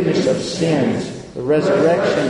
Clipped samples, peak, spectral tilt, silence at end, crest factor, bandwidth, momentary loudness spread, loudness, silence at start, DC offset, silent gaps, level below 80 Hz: under 0.1%; -4 dBFS; -6 dB/octave; 0 s; 14 dB; 11 kHz; 10 LU; -17 LUFS; 0 s; under 0.1%; none; -50 dBFS